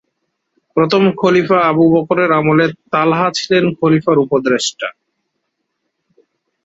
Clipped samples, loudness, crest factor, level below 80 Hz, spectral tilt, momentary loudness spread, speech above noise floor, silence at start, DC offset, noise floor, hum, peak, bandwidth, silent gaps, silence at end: under 0.1%; -13 LUFS; 14 dB; -56 dBFS; -5.5 dB/octave; 5 LU; 59 dB; 0.75 s; under 0.1%; -72 dBFS; none; 0 dBFS; 8 kHz; none; 1.75 s